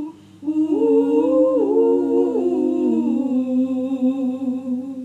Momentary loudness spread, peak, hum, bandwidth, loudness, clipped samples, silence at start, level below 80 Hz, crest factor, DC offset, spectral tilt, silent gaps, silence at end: 8 LU; -6 dBFS; none; 8 kHz; -19 LUFS; under 0.1%; 0 s; -78 dBFS; 12 dB; under 0.1%; -8 dB/octave; none; 0 s